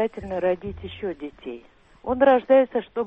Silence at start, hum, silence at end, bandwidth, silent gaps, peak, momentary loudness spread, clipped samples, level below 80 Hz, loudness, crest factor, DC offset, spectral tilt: 0 s; none; 0 s; 3.9 kHz; none; -8 dBFS; 20 LU; under 0.1%; -50 dBFS; -22 LUFS; 16 dB; under 0.1%; -8 dB/octave